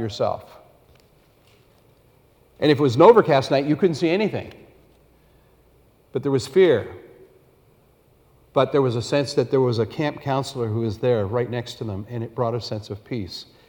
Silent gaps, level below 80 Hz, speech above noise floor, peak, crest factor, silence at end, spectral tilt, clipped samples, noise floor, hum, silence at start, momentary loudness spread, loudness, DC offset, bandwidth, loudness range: none; -58 dBFS; 37 dB; 0 dBFS; 22 dB; 0.25 s; -6.5 dB/octave; under 0.1%; -57 dBFS; none; 0 s; 15 LU; -21 LUFS; under 0.1%; 18.5 kHz; 6 LU